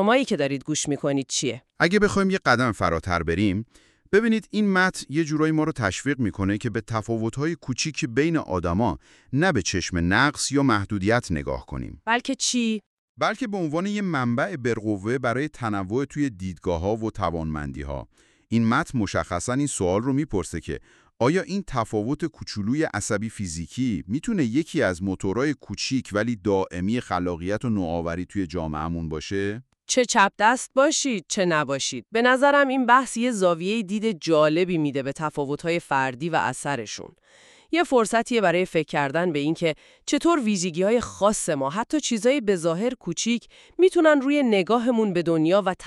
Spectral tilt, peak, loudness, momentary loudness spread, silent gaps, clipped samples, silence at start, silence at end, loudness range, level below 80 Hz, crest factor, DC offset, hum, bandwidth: -4.5 dB/octave; -4 dBFS; -24 LUFS; 9 LU; 12.86-13.15 s; under 0.1%; 0 s; 0 s; 5 LU; -48 dBFS; 20 dB; under 0.1%; none; 12.5 kHz